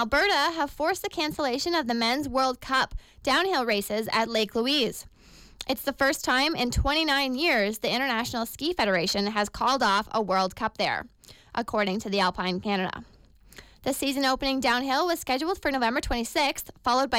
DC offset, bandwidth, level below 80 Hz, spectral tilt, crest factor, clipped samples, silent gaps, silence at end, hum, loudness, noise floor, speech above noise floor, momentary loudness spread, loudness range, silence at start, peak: under 0.1%; 17 kHz; -44 dBFS; -3.5 dB/octave; 14 dB; under 0.1%; none; 0 s; none; -26 LUFS; -51 dBFS; 25 dB; 7 LU; 3 LU; 0 s; -14 dBFS